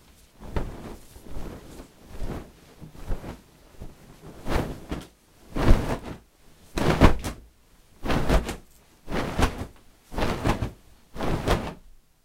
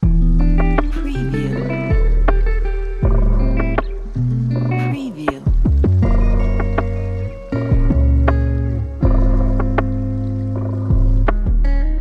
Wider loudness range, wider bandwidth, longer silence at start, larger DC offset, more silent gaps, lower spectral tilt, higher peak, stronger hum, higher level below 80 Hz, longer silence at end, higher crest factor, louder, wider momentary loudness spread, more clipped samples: first, 14 LU vs 2 LU; first, 16 kHz vs 4.8 kHz; first, 0.4 s vs 0 s; neither; neither; second, -6 dB/octave vs -9.5 dB/octave; about the same, 0 dBFS vs 0 dBFS; neither; second, -30 dBFS vs -16 dBFS; first, 0.3 s vs 0 s; first, 26 dB vs 14 dB; second, -28 LUFS vs -19 LUFS; first, 23 LU vs 7 LU; neither